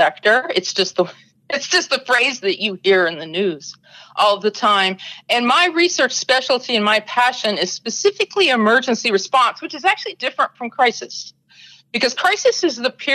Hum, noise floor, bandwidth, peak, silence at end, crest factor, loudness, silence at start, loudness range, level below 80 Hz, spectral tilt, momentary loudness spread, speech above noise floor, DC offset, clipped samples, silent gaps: none; -47 dBFS; 13.5 kHz; -4 dBFS; 0 s; 14 dB; -17 LUFS; 0 s; 3 LU; -68 dBFS; -2 dB/octave; 9 LU; 29 dB; under 0.1%; under 0.1%; none